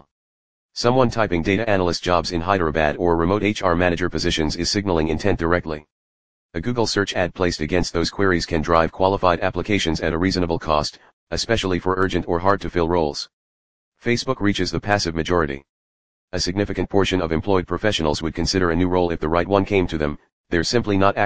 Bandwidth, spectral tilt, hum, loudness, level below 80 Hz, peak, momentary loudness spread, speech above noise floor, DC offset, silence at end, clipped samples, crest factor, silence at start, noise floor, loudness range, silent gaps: 10 kHz; -5 dB/octave; none; -21 LUFS; -38 dBFS; 0 dBFS; 6 LU; over 70 dB; 2%; 0 s; under 0.1%; 20 dB; 0 s; under -90 dBFS; 3 LU; 0.11-0.69 s, 5.91-6.49 s, 11.13-11.27 s, 13.33-13.92 s, 15.69-16.28 s, 20.32-20.44 s